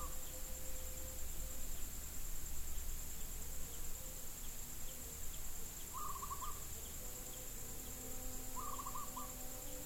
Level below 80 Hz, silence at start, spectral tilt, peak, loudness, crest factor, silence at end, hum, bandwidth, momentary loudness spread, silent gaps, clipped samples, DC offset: -48 dBFS; 0 s; -2.5 dB/octave; -30 dBFS; -47 LUFS; 14 dB; 0 s; none; 17 kHz; 2 LU; none; under 0.1%; under 0.1%